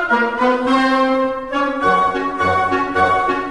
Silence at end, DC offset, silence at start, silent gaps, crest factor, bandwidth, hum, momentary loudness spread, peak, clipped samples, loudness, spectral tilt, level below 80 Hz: 0 s; 0.5%; 0 s; none; 14 dB; 11.5 kHz; none; 4 LU; -4 dBFS; under 0.1%; -16 LUFS; -5.5 dB/octave; -44 dBFS